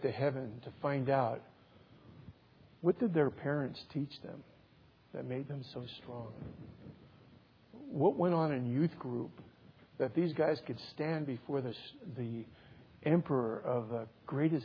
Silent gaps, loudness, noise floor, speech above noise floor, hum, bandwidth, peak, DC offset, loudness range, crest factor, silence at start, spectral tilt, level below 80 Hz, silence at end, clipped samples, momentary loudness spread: none; -36 LUFS; -64 dBFS; 29 dB; none; 5.4 kHz; -16 dBFS; under 0.1%; 10 LU; 20 dB; 0 s; -7 dB/octave; -72 dBFS; 0 s; under 0.1%; 18 LU